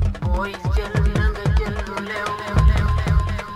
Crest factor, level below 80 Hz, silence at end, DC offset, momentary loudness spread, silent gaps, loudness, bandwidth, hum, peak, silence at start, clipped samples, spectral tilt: 16 dB; -22 dBFS; 0 s; under 0.1%; 7 LU; none; -21 LUFS; 11.5 kHz; none; -4 dBFS; 0 s; under 0.1%; -7 dB/octave